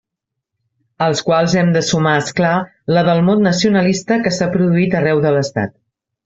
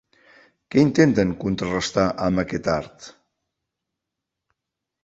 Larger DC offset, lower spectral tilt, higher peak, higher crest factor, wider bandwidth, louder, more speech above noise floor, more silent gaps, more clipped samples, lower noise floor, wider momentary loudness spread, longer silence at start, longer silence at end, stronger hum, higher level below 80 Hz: neither; about the same, -5.5 dB/octave vs -6 dB/octave; about the same, -2 dBFS vs -2 dBFS; second, 14 dB vs 22 dB; about the same, 7.8 kHz vs 8 kHz; first, -15 LUFS vs -21 LUFS; about the same, 66 dB vs 63 dB; neither; neither; second, -80 dBFS vs -84 dBFS; second, 5 LU vs 9 LU; first, 1 s vs 0.7 s; second, 0.55 s vs 1.95 s; neither; about the same, -52 dBFS vs -48 dBFS